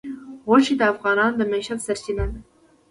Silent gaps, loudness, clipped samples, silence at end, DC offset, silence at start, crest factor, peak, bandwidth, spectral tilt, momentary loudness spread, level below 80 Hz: none; -21 LUFS; under 0.1%; 0.5 s; under 0.1%; 0.05 s; 18 dB; -4 dBFS; 11.5 kHz; -5 dB/octave; 15 LU; -38 dBFS